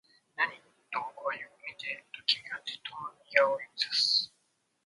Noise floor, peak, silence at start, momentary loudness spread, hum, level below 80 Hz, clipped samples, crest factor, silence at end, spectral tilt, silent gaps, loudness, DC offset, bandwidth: -75 dBFS; -6 dBFS; 0.4 s; 15 LU; none; -86 dBFS; under 0.1%; 28 dB; 0.6 s; 0 dB/octave; none; -31 LUFS; under 0.1%; 11.5 kHz